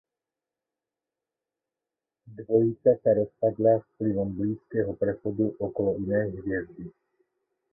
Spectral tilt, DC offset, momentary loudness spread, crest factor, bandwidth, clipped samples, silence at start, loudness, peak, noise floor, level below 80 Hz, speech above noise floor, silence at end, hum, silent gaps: -14.5 dB/octave; under 0.1%; 10 LU; 20 dB; 2.1 kHz; under 0.1%; 2.25 s; -27 LUFS; -8 dBFS; -89 dBFS; -58 dBFS; 63 dB; 0.85 s; none; none